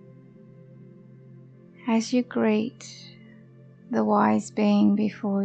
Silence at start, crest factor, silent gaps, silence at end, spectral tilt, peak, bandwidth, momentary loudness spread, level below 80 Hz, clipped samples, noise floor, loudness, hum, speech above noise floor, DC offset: 1.3 s; 16 dB; none; 0 s; -6.5 dB/octave; -10 dBFS; 8.6 kHz; 21 LU; -74 dBFS; under 0.1%; -50 dBFS; -24 LUFS; none; 27 dB; under 0.1%